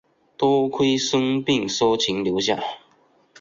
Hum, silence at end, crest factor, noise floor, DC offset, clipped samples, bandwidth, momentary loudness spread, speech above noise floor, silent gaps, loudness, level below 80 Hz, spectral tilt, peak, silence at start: none; 0.65 s; 16 dB; -59 dBFS; under 0.1%; under 0.1%; 7.8 kHz; 5 LU; 38 dB; none; -21 LUFS; -60 dBFS; -4 dB/octave; -6 dBFS; 0.4 s